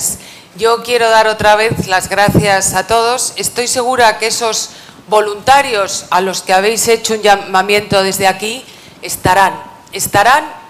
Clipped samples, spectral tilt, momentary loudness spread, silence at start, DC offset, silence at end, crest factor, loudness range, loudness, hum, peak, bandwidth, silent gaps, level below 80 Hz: under 0.1%; -2.5 dB/octave; 8 LU; 0 s; under 0.1%; 0 s; 12 dB; 2 LU; -12 LUFS; none; 0 dBFS; 16.5 kHz; none; -40 dBFS